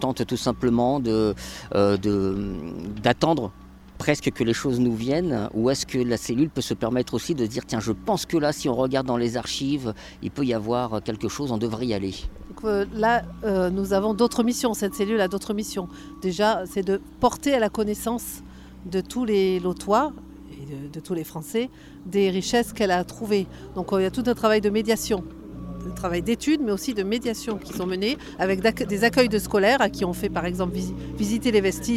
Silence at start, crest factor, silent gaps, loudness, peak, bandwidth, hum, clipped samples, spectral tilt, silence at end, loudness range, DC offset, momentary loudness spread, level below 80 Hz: 0 s; 20 dB; none; -24 LUFS; -6 dBFS; 16.5 kHz; none; under 0.1%; -5 dB/octave; 0 s; 4 LU; under 0.1%; 11 LU; -44 dBFS